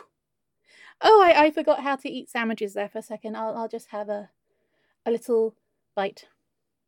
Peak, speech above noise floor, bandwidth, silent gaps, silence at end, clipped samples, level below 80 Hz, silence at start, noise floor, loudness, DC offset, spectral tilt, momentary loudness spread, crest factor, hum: -4 dBFS; 59 dB; 16.5 kHz; none; 0.65 s; under 0.1%; -68 dBFS; 1 s; -82 dBFS; -23 LUFS; under 0.1%; -4.5 dB/octave; 18 LU; 20 dB; none